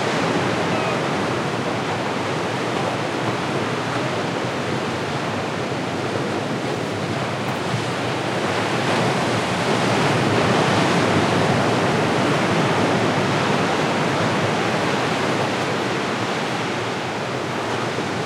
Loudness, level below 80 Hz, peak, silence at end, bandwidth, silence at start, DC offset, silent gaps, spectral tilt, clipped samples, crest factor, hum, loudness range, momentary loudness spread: -21 LUFS; -56 dBFS; -6 dBFS; 0 s; 16 kHz; 0 s; under 0.1%; none; -5 dB/octave; under 0.1%; 16 dB; none; 5 LU; 6 LU